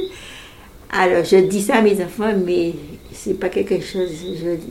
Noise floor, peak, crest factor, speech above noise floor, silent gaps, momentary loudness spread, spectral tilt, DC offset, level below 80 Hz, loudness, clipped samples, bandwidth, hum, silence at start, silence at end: -41 dBFS; -2 dBFS; 16 dB; 23 dB; none; 19 LU; -5.5 dB/octave; under 0.1%; -46 dBFS; -18 LUFS; under 0.1%; 16 kHz; none; 0 s; 0 s